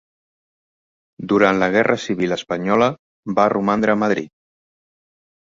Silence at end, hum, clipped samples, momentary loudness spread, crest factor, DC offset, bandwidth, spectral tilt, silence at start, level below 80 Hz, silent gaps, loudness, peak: 1.35 s; none; under 0.1%; 9 LU; 20 dB; under 0.1%; 7.6 kHz; -6 dB/octave; 1.2 s; -58 dBFS; 2.99-3.23 s; -18 LUFS; -2 dBFS